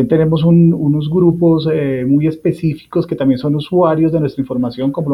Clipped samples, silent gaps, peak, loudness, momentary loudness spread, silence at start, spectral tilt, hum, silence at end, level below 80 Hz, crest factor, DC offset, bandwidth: under 0.1%; none; -2 dBFS; -14 LUFS; 8 LU; 0 s; -10 dB/octave; none; 0 s; -46 dBFS; 12 dB; under 0.1%; 5.4 kHz